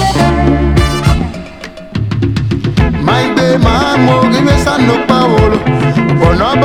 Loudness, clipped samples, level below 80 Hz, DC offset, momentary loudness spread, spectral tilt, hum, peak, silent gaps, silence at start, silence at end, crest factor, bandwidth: -10 LUFS; 0.3%; -20 dBFS; 0.8%; 8 LU; -6.5 dB/octave; none; 0 dBFS; none; 0 s; 0 s; 10 dB; 15 kHz